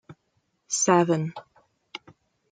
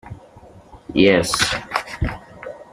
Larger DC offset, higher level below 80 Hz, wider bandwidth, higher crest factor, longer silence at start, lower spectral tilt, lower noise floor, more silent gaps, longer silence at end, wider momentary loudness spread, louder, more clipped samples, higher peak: neither; second, -72 dBFS vs -38 dBFS; second, 9.6 kHz vs 14.5 kHz; about the same, 22 dB vs 20 dB; about the same, 0.1 s vs 0.05 s; about the same, -4.5 dB/octave vs -4 dB/octave; first, -73 dBFS vs -45 dBFS; neither; first, 0.55 s vs 0.1 s; about the same, 22 LU vs 22 LU; second, -23 LUFS vs -19 LUFS; neither; second, -6 dBFS vs -2 dBFS